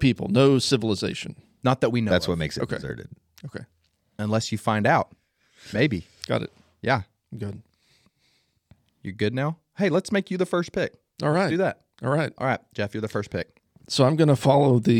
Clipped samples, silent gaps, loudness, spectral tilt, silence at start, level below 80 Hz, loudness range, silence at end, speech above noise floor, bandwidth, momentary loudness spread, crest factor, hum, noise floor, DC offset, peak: under 0.1%; none; -24 LUFS; -6 dB/octave; 0 s; -54 dBFS; 6 LU; 0 s; 44 dB; 15 kHz; 18 LU; 20 dB; none; -68 dBFS; under 0.1%; -6 dBFS